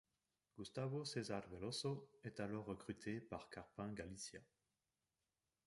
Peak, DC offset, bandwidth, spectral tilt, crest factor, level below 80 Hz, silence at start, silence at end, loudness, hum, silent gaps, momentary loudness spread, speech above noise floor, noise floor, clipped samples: -32 dBFS; under 0.1%; 11.5 kHz; -5 dB/octave; 18 dB; -74 dBFS; 0.55 s; 1.2 s; -49 LUFS; none; none; 9 LU; over 41 dB; under -90 dBFS; under 0.1%